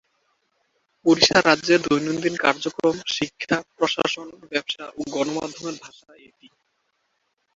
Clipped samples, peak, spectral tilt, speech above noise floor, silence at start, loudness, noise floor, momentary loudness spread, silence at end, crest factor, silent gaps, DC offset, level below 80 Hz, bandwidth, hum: under 0.1%; -2 dBFS; -3.5 dB/octave; 50 dB; 1.05 s; -22 LUFS; -72 dBFS; 14 LU; 1.7 s; 22 dB; none; under 0.1%; -60 dBFS; 7.8 kHz; none